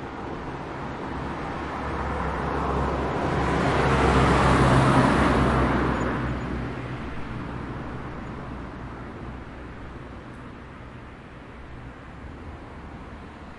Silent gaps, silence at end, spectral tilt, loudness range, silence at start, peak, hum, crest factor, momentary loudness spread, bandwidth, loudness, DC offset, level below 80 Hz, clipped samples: none; 0 s; -6.5 dB/octave; 20 LU; 0 s; -6 dBFS; none; 20 dB; 22 LU; 11.5 kHz; -25 LUFS; under 0.1%; -36 dBFS; under 0.1%